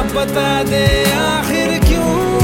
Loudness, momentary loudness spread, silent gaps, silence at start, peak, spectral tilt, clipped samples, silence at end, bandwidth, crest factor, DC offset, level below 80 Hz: -14 LUFS; 3 LU; none; 0 s; 0 dBFS; -5 dB/octave; under 0.1%; 0 s; 17 kHz; 14 dB; under 0.1%; -22 dBFS